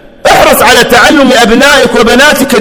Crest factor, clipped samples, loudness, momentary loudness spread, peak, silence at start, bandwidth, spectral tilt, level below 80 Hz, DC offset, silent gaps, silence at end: 4 dB; 20%; -3 LUFS; 2 LU; 0 dBFS; 0.25 s; over 20 kHz; -3 dB/octave; -28 dBFS; under 0.1%; none; 0 s